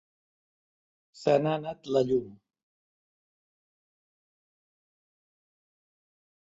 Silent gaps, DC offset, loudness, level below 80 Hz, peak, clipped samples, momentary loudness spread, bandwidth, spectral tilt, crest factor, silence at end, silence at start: none; under 0.1%; -28 LUFS; -72 dBFS; -10 dBFS; under 0.1%; 8 LU; 7.8 kHz; -7 dB/octave; 24 dB; 4.25 s; 1.2 s